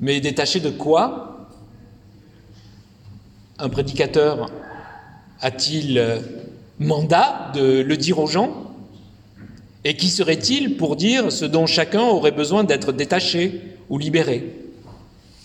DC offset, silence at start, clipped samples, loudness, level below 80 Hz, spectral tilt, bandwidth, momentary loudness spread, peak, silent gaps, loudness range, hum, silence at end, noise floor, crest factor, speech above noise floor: under 0.1%; 0 s; under 0.1%; -19 LUFS; -52 dBFS; -4.5 dB/octave; 13.5 kHz; 18 LU; -2 dBFS; none; 7 LU; none; 0.5 s; -47 dBFS; 18 dB; 28 dB